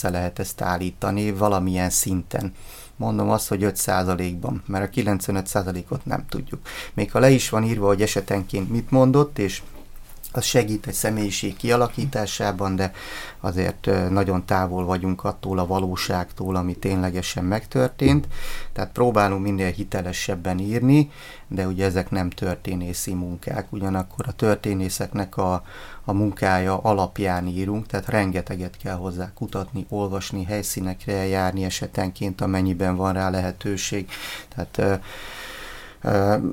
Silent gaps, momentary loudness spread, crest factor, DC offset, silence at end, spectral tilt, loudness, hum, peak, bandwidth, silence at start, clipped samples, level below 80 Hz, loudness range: none; 11 LU; 20 dB; under 0.1%; 0 s; -5.5 dB/octave; -23 LUFS; none; -2 dBFS; 17 kHz; 0 s; under 0.1%; -40 dBFS; 4 LU